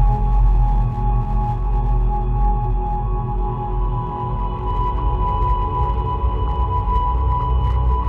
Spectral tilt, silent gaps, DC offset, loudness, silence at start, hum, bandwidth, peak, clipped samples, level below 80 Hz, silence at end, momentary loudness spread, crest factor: -10 dB/octave; none; under 0.1%; -21 LUFS; 0 s; none; 3.5 kHz; -6 dBFS; under 0.1%; -20 dBFS; 0 s; 5 LU; 12 dB